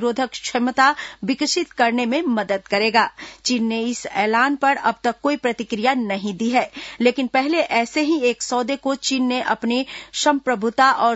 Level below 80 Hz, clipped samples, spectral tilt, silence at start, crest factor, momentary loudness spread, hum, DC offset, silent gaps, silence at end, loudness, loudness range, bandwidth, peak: -60 dBFS; under 0.1%; -3 dB/octave; 0 s; 18 dB; 7 LU; none; under 0.1%; none; 0 s; -20 LUFS; 1 LU; 8 kHz; -2 dBFS